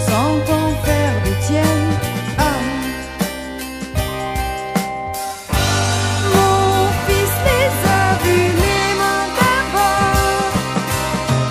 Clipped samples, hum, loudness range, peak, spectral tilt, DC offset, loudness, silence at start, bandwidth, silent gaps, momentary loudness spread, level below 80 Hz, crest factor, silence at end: under 0.1%; none; 6 LU; 0 dBFS; -4.5 dB/octave; under 0.1%; -17 LUFS; 0 s; 15.5 kHz; none; 8 LU; -30 dBFS; 16 dB; 0 s